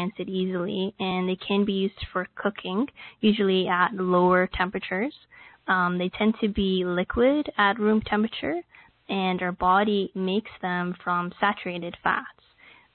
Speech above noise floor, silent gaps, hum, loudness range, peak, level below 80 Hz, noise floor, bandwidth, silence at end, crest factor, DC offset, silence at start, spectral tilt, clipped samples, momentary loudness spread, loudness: 30 dB; none; none; 2 LU; -8 dBFS; -50 dBFS; -55 dBFS; 4.5 kHz; 0.65 s; 18 dB; under 0.1%; 0 s; -10.5 dB/octave; under 0.1%; 8 LU; -25 LUFS